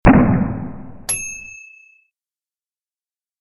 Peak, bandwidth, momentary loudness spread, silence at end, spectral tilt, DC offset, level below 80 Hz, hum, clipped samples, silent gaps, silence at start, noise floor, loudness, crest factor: -2 dBFS; 15 kHz; 21 LU; 1.85 s; -6 dB/octave; under 0.1%; -30 dBFS; none; under 0.1%; none; 0.05 s; under -90 dBFS; -19 LUFS; 18 dB